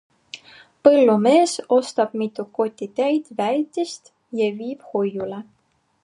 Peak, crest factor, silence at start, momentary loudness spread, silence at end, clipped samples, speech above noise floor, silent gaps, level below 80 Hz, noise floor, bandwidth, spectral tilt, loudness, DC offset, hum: 0 dBFS; 20 dB; 0.35 s; 20 LU; 0.6 s; under 0.1%; 28 dB; none; -72 dBFS; -48 dBFS; 11.5 kHz; -5 dB/octave; -20 LUFS; under 0.1%; none